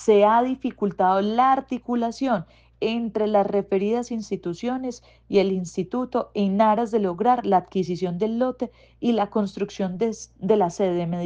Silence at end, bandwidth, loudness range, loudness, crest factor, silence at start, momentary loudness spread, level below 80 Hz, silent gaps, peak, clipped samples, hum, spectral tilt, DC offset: 0 s; 9.2 kHz; 2 LU; -23 LUFS; 16 dB; 0 s; 9 LU; -58 dBFS; none; -6 dBFS; under 0.1%; none; -6.5 dB/octave; under 0.1%